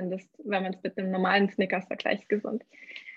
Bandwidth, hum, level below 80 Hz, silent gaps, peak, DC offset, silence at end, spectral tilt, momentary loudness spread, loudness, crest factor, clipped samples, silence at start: 7.2 kHz; none; -78 dBFS; none; -8 dBFS; under 0.1%; 0 s; -7 dB/octave; 13 LU; -29 LUFS; 20 dB; under 0.1%; 0 s